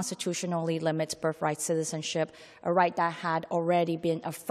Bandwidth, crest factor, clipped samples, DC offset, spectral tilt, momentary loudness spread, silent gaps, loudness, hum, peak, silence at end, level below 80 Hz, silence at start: 14 kHz; 18 dB; under 0.1%; under 0.1%; -4.5 dB/octave; 6 LU; none; -30 LUFS; none; -10 dBFS; 0 s; -74 dBFS; 0 s